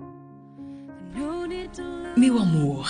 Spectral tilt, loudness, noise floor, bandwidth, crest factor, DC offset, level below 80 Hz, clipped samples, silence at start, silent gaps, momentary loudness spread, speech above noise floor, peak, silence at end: -6.5 dB/octave; -24 LUFS; -45 dBFS; 10 kHz; 16 dB; under 0.1%; -50 dBFS; under 0.1%; 0 s; none; 22 LU; 23 dB; -8 dBFS; 0 s